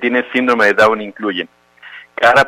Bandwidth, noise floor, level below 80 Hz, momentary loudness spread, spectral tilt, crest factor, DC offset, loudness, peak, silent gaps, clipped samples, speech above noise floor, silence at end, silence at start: 15.5 kHz; -38 dBFS; -54 dBFS; 15 LU; -4.5 dB/octave; 14 dB; under 0.1%; -14 LUFS; -2 dBFS; none; under 0.1%; 25 dB; 0 s; 0 s